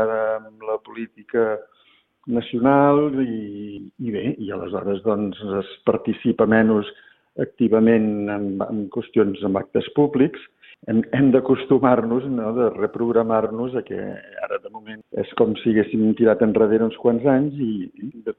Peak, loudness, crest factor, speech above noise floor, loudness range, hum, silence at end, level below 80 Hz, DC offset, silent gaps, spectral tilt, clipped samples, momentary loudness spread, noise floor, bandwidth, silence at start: -2 dBFS; -21 LUFS; 18 dB; 39 dB; 4 LU; none; 0.05 s; -58 dBFS; under 0.1%; none; -11 dB/octave; under 0.1%; 14 LU; -59 dBFS; 4.1 kHz; 0 s